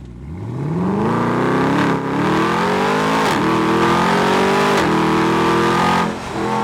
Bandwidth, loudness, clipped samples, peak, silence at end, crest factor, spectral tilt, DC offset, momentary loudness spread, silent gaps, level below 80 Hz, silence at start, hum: 16.5 kHz; -16 LUFS; under 0.1%; -6 dBFS; 0 s; 10 dB; -5.5 dB/octave; under 0.1%; 7 LU; none; -44 dBFS; 0 s; none